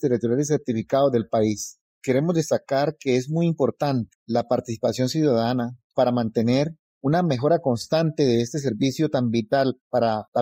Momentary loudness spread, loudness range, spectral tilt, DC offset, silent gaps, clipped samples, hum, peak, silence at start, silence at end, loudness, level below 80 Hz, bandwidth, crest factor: 5 LU; 1 LU; -6.5 dB/octave; under 0.1%; 1.81-2.01 s, 4.15-4.26 s, 5.84-5.90 s, 6.79-7.01 s, 9.81-9.91 s, 10.28-10.32 s; under 0.1%; none; -8 dBFS; 0 s; 0 s; -23 LUFS; -60 dBFS; 16 kHz; 14 dB